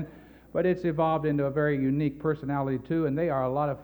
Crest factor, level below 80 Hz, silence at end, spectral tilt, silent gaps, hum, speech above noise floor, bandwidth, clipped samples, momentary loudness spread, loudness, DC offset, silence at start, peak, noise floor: 14 dB; -54 dBFS; 0 s; -10 dB/octave; none; none; 22 dB; over 20 kHz; under 0.1%; 4 LU; -28 LUFS; under 0.1%; 0 s; -14 dBFS; -49 dBFS